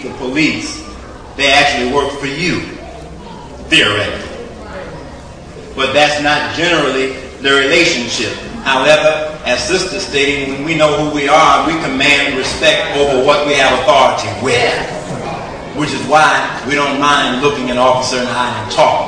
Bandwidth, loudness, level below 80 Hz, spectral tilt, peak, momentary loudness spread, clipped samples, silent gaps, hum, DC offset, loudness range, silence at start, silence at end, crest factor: 10.5 kHz; -12 LUFS; -38 dBFS; -3.5 dB/octave; 0 dBFS; 18 LU; under 0.1%; none; none; under 0.1%; 4 LU; 0 s; 0 s; 14 dB